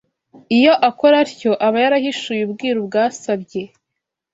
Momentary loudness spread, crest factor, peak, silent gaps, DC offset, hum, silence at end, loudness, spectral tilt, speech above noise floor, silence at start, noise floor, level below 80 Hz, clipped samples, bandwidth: 10 LU; 16 dB; -2 dBFS; none; under 0.1%; none; 0.65 s; -16 LUFS; -4.5 dB/octave; 64 dB; 0.5 s; -80 dBFS; -64 dBFS; under 0.1%; 8 kHz